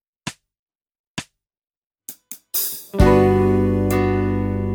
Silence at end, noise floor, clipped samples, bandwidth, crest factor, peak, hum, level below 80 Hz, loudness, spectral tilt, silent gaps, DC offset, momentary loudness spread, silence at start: 0 s; -39 dBFS; under 0.1%; 19.5 kHz; 18 dB; -2 dBFS; none; -30 dBFS; -18 LUFS; -6.5 dB/octave; 0.59-0.67 s, 0.99-1.15 s, 1.77-1.90 s; under 0.1%; 22 LU; 0.25 s